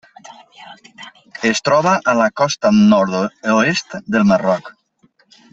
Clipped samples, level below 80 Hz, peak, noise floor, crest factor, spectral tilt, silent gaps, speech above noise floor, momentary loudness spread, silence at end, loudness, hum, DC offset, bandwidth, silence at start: under 0.1%; -56 dBFS; -2 dBFS; -57 dBFS; 16 dB; -5 dB/octave; none; 42 dB; 9 LU; 0.8 s; -15 LUFS; none; under 0.1%; 8 kHz; 0.3 s